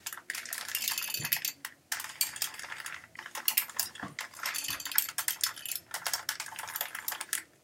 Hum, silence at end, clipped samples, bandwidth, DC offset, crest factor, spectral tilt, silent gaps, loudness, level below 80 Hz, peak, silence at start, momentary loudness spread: none; 0.2 s; under 0.1%; 17 kHz; under 0.1%; 32 dB; 1 dB/octave; none; -33 LUFS; -76 dBFS; -4 dBFS; 0 s; 11 LU